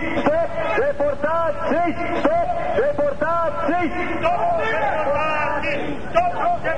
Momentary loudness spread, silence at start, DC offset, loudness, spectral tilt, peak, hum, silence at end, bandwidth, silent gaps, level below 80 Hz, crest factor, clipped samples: 2 LU; 0 s; 5%; -21 LUFS; -6.5 dB/octave; -4 dBFS; none; 0 s; 9.6 kHz; none; -42 dBFS; 18 dB; under 0.1%